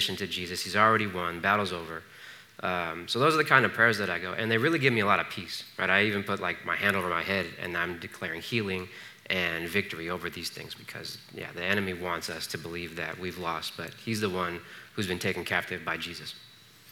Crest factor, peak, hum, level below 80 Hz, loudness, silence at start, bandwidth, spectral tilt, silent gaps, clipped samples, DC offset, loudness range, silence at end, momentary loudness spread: 24 dB; -6 dBFS; none; -70 dBFS; -28 LUFS; 0 s; 19 kHz; -4 dB/octave; none; under 0.1%; under 0.1%; 8 LU; 0 s; 16 LU